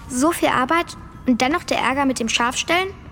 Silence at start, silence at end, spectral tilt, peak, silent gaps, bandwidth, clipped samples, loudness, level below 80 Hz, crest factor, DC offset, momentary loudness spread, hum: 0 s; 0 s; -3 dB/octave; -4 dBFS; none; 17.5 kHz; under 0.1%; -19 LUFS; -44 dBFS; 18 dB; under 0.1%; 4 LU; none